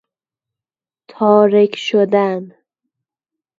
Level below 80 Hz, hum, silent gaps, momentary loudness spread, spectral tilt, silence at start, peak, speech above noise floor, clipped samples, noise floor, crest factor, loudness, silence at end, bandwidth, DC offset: -70 dBFS; none; none; 9 LU; -6.5 dB/octave; 1.2 s; 0 dBFS; over 77 dB; under 0.1%; under -90 dBFS; 16 dB; -14 LUFS; 1.1 s; 7.4 kHz; under 0.1%